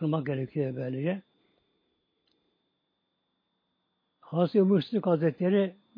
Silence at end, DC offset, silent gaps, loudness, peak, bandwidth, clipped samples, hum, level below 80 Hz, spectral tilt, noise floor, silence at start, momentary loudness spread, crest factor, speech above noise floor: 0.25 s; under 0.1%; none; -28 LUFS; -12 dBFS; 5.2 kHz; under 0.1%; none; -80 dBFS; -10.5 dB/octave; -79 dBFS; 0 s; 8 LU; 18 dB; 52 dB